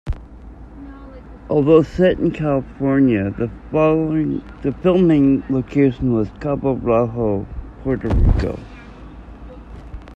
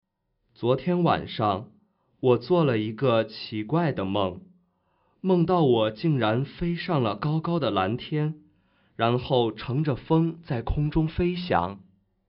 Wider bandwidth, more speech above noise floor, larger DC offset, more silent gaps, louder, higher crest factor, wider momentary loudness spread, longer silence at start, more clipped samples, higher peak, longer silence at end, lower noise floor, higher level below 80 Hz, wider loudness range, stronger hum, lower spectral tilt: first, 7.6 kHz vs 5.6 kHz; second, 21 dB vs 49 dB; neither; neither; first, -18 LUFS vs -25 LUFS; about the same, 18 dB vs 18 dB; first, 25 LU vs 9 LU; second, 0.05 s vs 0.6 s; neither; first, 0 dBFS vs -8 dBFS; second, 0 s vs 0.5 s; second, -38 dBFS vs -74 dBFS; first, -30 dBFS vs -46 dBFS; about the same, 4 LU vs 2 LU; neither; first, -9.5 dB/octave vs -6 dB/octave